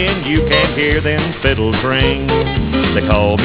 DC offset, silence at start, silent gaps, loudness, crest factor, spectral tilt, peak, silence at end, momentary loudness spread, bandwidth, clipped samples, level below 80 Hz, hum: 0.5%; 0 s; none; -14 LUFS; 14 dB; -10 dB/octave; 0 dBFS; 0 s; 3 LU; 4 kHz; under 0.1%; -24 dBFS; none